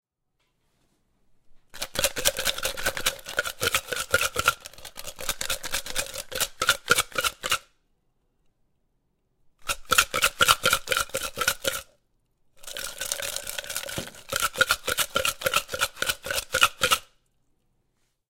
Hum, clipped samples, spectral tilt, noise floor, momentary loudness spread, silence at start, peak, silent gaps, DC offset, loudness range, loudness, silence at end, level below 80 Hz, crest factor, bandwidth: none; under 0.1%; -0.5 dB/octave; -75 dBFS; 12 LU; 1.5 s; 0 dBFS; none; under 0.1%; 5 LU; -25 LUFS; 1.25 s; -48 dBFS; 28 dB; 17 kHz